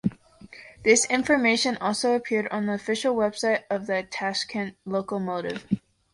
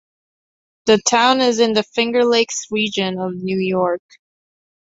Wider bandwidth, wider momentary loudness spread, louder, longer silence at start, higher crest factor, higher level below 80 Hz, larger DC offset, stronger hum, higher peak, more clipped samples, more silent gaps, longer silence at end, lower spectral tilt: first, 11.5 kHz vs 8 kHz; about the same, 11 LU vs 9 LU; second, -25 LUFS vs -17 LUFS; second, 0.05 s vs 0.85 s; about the same, 20 dB vs 18 dB; about the same, -62 dBFS vs -62 dBFS; neither; neither; second, -6 dBFS vs -2 dBFS; neither; neither; second, 0.35 s vs 0.95 s; about the same, -3.5 dB/octave vs -3.5 dB/octave